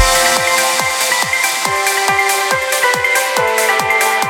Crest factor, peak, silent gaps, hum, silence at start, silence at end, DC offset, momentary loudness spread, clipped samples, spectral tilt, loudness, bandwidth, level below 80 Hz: 14 dB; 0 dBFS; none; none; 0 s; 0 s; under 0.1%; 3 LU; under 0.1%; -0.5 dB/octave; -13 LUFS; 20 kHz; -36 dBFS